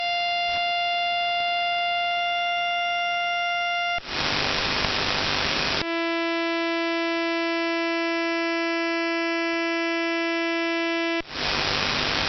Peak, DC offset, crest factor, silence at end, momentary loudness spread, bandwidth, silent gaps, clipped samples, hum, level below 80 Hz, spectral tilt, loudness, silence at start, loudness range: -4 dBFS; under 0.1%; 20 dB; 0 s; 2 LU; 6.4 kHz; none; under 0.1%; none; -50 dBFS; -1 dB/octave; -24 LUFS; 0 s; 1 LU